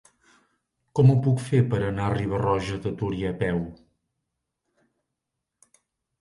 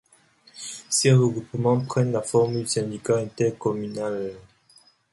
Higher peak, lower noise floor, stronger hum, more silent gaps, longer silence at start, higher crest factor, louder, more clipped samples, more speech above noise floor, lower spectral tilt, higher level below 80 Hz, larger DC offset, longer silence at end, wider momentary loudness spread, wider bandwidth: about the same, -8 dBFS vs -6 dBFS; first, -83 dBFS vs -58 dBFS; neither; neither; first, 0.95 s vs 0.55 s; about the same, 20 dB vs 18 dB; about the same, -24 LUFS vs -23 LUFS; neither; first, 60 dB vs 35 dB; first, -8 dB/octave vs -5.5 dB/octave; first, -48 dBFS vs -62 dBFS; neither; first, 2.45 s vs 0.7 s; about the same, 11 LU vs 13 LU; about the same, 11.5 kHz vs 11.5 kHz